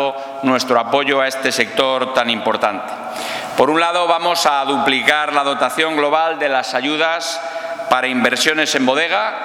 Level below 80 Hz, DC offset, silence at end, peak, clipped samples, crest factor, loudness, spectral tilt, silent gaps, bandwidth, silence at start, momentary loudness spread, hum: -64 dBFS; under 0.1%; 0 s; 0 dBFS; under 0.1%; 16 dB; -16 LUFS; -2.5 dB/octave; none; 18.5 kHz; 0 s; 8 LU; none